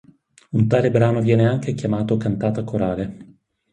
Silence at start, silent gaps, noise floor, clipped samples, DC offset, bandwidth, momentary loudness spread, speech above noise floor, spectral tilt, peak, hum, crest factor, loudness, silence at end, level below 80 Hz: 0.5 s; none; -42 dBFS; under 0.1%; under 0.1%; 9.2 kHz; 7 LU; 24 dB; -8.5 dB/octave; -4 dBFS; none; 16 dB; -20 LUFS; 0.5 s; -48 dBFS